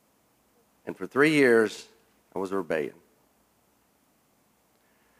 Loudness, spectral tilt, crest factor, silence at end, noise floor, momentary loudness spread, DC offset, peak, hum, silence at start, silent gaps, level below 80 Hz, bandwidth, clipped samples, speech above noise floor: -25 LUFS; -5 dB/octave; 22 dB; 2.3 s; -67 dBFS; 21 LU; under 0.1%; -8 dBFS; none; 0.85 s; none; -78 dBFS; 15.5 kHz; under 0.1%; 42 dB